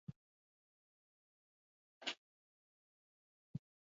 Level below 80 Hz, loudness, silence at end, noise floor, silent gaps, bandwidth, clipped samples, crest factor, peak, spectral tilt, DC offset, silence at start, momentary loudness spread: -82 dBFS; -50 LUFS; 0.35 s; under -90 dBFS; 0.16-2.01 s, 2.18-3.54 s; 7 kHz; under 0.1%; 30 dB; -26 dBFS; -2.5 dB/octave; under 0.1%; 0.1 s; 8 LU